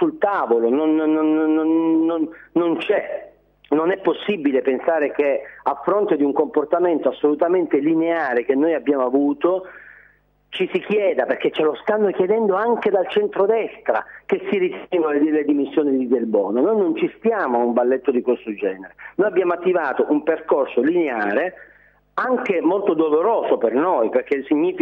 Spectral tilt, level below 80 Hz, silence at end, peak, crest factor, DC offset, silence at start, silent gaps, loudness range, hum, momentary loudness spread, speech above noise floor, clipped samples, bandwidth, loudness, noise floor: -8 dB/octave; -64 dBFS; 0 s; -4 dBFS; 14 dB; under 0.1%; 0 s; none; 2 LU; 50 Hz at -65 dBFS; 5 LU; 37 dB; under 0.1%; 4.3 kHz; -20 LUFS; -56 dBFS